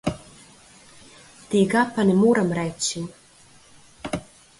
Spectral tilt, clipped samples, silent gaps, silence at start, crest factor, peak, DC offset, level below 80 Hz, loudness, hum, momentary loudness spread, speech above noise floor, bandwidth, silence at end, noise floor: -5 dB/octave; under 0.1%; none; 0.05 s; 16 dB; -8 dBFS; under 0.1%; -54 dBFS; -22 LUFS; none; 17 LU; 32 dB; 11.5 kHz; 0.35 s; -52 dBFS